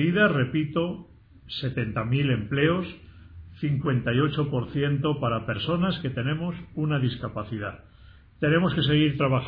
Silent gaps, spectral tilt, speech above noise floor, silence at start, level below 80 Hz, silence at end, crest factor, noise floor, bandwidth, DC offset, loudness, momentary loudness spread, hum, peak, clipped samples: none; -10 dB/octave; 26 dB; 0 s; -50 dBFS; 0 s; 16 dB; -51 dBFS; 5 kHz; under 0.1%; -26 LUFS; 11 LU; none; -8 dBFS; under 0.1%